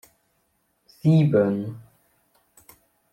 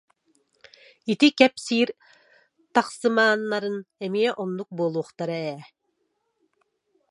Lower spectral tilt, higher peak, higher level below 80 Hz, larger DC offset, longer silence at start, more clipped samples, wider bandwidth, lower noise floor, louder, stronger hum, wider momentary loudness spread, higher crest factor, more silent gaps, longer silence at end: first, -9.5 dB/octave vs -4.5 dB/octave; second, -8 dBFS vs -2 dBFS; first, -64 dBFS vs -74 dBFS; neither; about the same, 1.05 s vs 1.05 s; neither; first, 15 kHz vs 11.5 kHz; second, -70 dBFS vs -74 dBFS; first, -21 LUFS vs -24 LUFS; neither; first, 18 LU vs 12 LU; second, 18 dB vs 24 dB; neither; second, 1.3 s vs 1.45 s